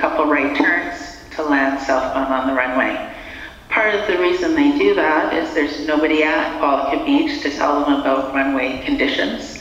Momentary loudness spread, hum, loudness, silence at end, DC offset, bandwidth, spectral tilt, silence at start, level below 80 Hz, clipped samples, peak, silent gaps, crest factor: 7 LU; none; -18 LUFS; 0 s; under 0.1%; 8.2 kHz; -4.5 dB/octave; 0 s; -44 dBFS; under 0.1%; 0 dBFS; none; 18 dB